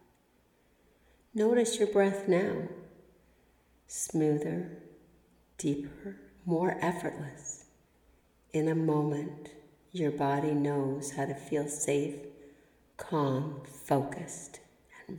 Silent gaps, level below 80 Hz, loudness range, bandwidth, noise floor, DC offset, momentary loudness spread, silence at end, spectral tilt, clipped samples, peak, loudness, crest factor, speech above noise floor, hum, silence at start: none; -68 dBFS; 5 LU; 19.5 kHz; -68 dBFS; under 0.1%; 18 LU; 0 s; -5.5 dB/octave; under 0.1%; -14 dBFS; -32 LUFS; 20 dB; 37 dB; none; 1.35 s